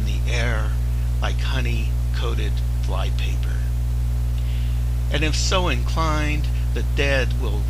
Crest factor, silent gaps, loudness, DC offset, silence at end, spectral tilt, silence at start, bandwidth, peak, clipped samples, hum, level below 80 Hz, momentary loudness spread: 16 dB; none; -23 LUFS; under 0.1%; 0 s; -5 dB/octave; 0 s; 15 kHz; -4 dBFS; under 0.1%; 60 Hz at -20 dBFS; -22 dBFS; 4 LU